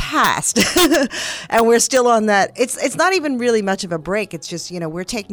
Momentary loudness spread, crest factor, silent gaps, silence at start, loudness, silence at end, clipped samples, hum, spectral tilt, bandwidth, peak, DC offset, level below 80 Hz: 12 LU; 16 dB; none; 0 s; -17 LUFS; 0 s; under 0.1%; none; -3 dB/octave; over 20 kHz; -2 dBFS; under 0.1%; -46 dBFS